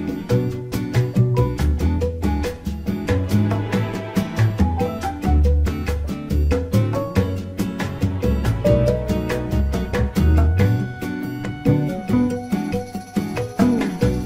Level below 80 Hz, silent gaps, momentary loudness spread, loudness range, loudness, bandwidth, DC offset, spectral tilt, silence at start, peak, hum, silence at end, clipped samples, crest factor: -26 dBFS; none; 8 LU; 2 LU; -21 LUFS; 16 kHz; under 0.1%; -7.5 dB/octave; 0 s; -4 dBFS; none; 0 s; under 0.1%; 16 dB